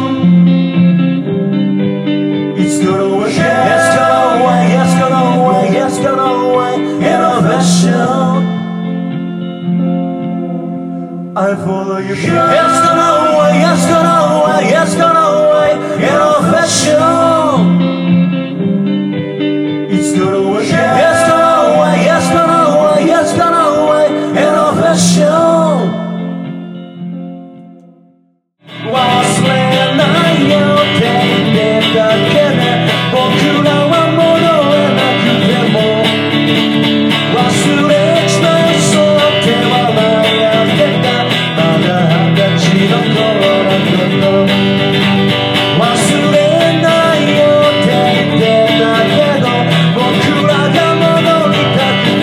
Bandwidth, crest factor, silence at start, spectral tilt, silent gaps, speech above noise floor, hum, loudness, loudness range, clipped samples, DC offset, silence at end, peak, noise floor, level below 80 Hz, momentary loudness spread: 14.5 kHz; 10 dB; 0 s; -5.5 dB/octave; none; 42 dB; none; -10 LUFS; 4 LU; under 0.1%; under 0.1%; 0 s; 0 dBFS; -54 dBFS; -50 dBFS; 7 LU